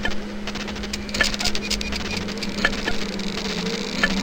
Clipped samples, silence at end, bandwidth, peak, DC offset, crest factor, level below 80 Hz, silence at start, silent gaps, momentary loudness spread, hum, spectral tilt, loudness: under 0.1%; 0 s; 17 kHz; -4 dBFS; under 0.1%; 22 dB; -34 dBFS; 0 s; none; 7 LU; none; -3 dB/octave; -25 LUFS